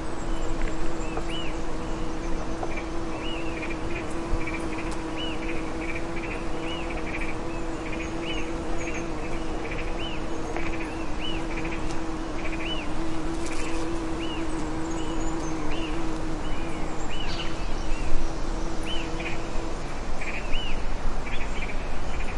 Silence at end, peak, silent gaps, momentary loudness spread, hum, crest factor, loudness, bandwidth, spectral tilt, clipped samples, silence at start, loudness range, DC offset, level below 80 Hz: 0 s; -6 dBFS; none; 2 LU; none; 18 dB; -32 LUFS; 10.5 kHz; -5 dB/octave; under 0.1%; 0 s; 1 LU; under 0.1%; -30 dBFS